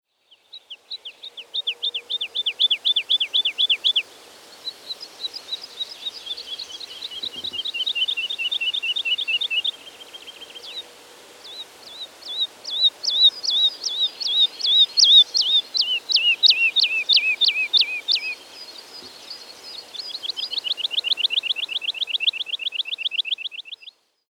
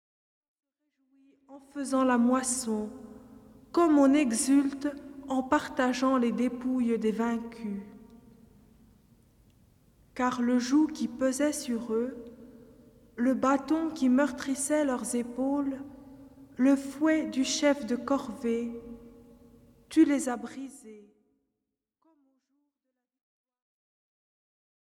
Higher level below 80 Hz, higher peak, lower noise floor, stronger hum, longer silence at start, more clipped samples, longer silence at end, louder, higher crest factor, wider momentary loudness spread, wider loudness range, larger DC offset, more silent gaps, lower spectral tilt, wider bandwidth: second, -78 dBFS vs -64 dBFS; first, -4 dBFS vs -10 dBFS; second, -58 dBFS vs -86 dBFS; neither; second, 0.55 s vs 1.5 s; neither; second, 0.4 s vs 4 s; first, -19 LUFS vs -28 LUFS; about the same, 20 dB vs 20 dB; about the same, 21 LU vs 19 LU; first, 12 LU vs 6 LU; neither; neither; second, 3 dB/octave vs -4 dB/octave; first, 18.5 kHz vs 14 kHz